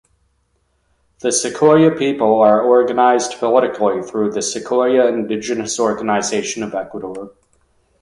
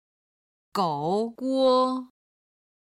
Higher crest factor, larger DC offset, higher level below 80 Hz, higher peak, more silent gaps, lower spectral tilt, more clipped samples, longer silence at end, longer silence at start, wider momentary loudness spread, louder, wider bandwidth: about the same, 16 dB vs 16 dB; neither; first, -58 dBFS vs -74 dBFS; first, 0 dBFS vs -10 dBFS; neither; second, -4 dB/octave vs -6.5 dB/octave; neither; about the same, 0.7 s vs 0.8 s; first, 1.25 s vs 0.75 s; about the same, 12 LU vs 10 LU; first, -16 LUFS vs -25 LUFS; second, 11.5 kHz vs 15 kHz